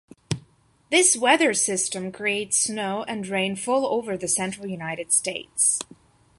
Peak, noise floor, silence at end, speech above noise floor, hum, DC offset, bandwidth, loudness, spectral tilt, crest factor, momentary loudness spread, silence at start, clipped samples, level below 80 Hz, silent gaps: -4 dBFS; -57 dBFS; 0.55 s; 33 dB; none; under 0.1%; 12 kHz; -23 LUFS; -2 dB/octave; 20 dB; 13 LU; 0.3 s; under 0.1%; -62 dBFS; none